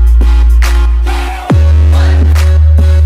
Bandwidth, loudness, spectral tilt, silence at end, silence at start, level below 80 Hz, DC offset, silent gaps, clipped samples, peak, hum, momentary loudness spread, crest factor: 12 kHz; -9 LUFS; -6.5 dB/octave; 0 s; 0 s; -6 dBFS; under 0.1%; none; under 0.1%; 0 dBFS; none; 5 LU; 6 dB